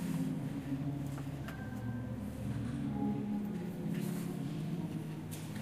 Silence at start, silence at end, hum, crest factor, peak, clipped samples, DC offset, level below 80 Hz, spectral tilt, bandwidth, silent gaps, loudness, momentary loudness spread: 0 s; 0 s; none; 14 dB; -26 dBFS; under 0.1%; under 0.1%; -56 dBFS; -7 dB/octave; 15.5 kHz; none; -39 LUFS; 6 LU